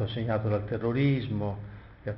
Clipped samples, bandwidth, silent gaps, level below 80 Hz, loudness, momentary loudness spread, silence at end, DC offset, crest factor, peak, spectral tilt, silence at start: under 0.1%; 5.6 kHz; none; -52 dBFS; -29 LUFS; 14 LU; 0 s; under 0.1%; 14 dB; -16 dBFS; -7 dB/octave; 0 s